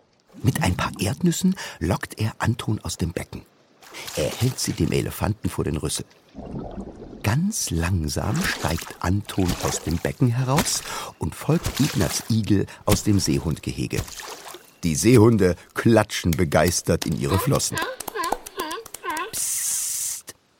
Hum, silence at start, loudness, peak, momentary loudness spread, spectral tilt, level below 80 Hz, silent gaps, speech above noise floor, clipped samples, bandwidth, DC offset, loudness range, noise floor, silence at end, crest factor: none; 0.35 s; -23 LUFS; -2 dBFS; 12 LU; -5 dB/octave; -42 dBFS; none; 20 dB; under 0.1%; 17 kHz; under 0.1%; 6 LU; -43 dBFS; 0.3 s; 22 dB